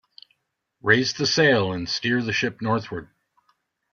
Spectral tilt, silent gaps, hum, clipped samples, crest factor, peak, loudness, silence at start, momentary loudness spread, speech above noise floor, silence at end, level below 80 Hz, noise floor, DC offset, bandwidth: -4 dB/octave; none; none; under 0.1%; 22 dB; -4 dBFS; -22 LUFS; 0.85 s; 10 LU; 51 dB; 0.85 s; -60 dBFS; -73 dBFS; under 0.1%; 7.2 kHz